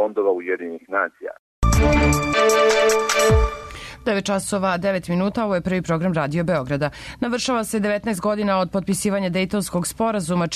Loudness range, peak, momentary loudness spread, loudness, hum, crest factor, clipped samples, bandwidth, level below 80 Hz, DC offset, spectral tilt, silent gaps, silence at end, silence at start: 4 LU; -6 dBFS; 9 LU; -21 LUFS; none; 14 dB; under 0.1%; 13.5 kHz; -30 dBFS; under 0.1%; -5 dB/octave; 1.39-1.62 s; 0 s; 0 s